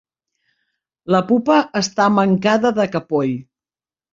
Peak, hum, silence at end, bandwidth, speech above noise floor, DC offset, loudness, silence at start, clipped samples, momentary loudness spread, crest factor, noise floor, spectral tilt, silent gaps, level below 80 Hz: -2 dBFS; none; 0.7 s; 7.6 kHz; over 74 dB; under 0.1%; -17 LUFS; 1.05 s; under 0.1%; 7 LU; 16 dB; under -90 dBFS; -5.5 dB/octave; none; -60 dBFS